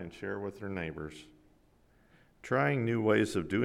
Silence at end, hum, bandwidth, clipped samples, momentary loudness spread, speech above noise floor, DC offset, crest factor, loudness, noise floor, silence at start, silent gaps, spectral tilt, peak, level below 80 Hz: 0 s; none; 13.5 kHz; under 0.1%; 17 LU; 33 dB; under 0.1%; 18 dB; -32 LUFS; -65 dBFS; 0 s; none; -6.5 dB/octave; -14 dBFS; -62 dBFS